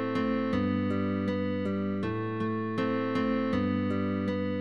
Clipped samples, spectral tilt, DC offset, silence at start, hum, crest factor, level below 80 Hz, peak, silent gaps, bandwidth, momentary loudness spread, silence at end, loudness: under 0.1%; -8.5 dB/octave; 0.3%; 0 s; none; 12 dB; -58 dBFS; -18 dBFS; none; 7 kHz; 3 LU; 0 s; -30 LUFS